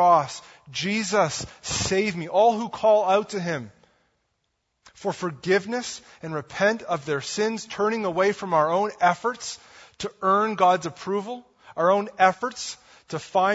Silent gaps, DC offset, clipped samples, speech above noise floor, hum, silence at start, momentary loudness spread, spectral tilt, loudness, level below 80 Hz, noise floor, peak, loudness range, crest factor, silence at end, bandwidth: none; under 0.1%; under 0.1%; 52 dB; none; 0 s; 15 LU; -4 dB/octave; -24 LUFS; -60 dBFS; -75 dBFS; -4 dBFS; 5 LU; 20 dB; 0 s; 8 kHz